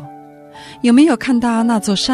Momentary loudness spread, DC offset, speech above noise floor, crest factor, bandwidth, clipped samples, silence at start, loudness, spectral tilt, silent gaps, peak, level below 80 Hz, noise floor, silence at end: 5 LU; under 0.1%; 24 dB; 14 dB; 13 kHz; under 0.1%; 0 s; -14 LUFS; -4.5 dB/octave; none; 0 dBFS; -52 dBFS; -38 dBFS; 0 s